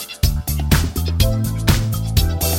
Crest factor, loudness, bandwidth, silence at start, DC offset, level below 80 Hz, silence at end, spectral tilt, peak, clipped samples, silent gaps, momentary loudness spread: 16 dB; -19 LUFS; 17 kHz; 0 s; under 0.1%; -22 dBFS; 0 s; -4.5 dB/octave; 0 dBFS; under 0.1%; none; 3 LU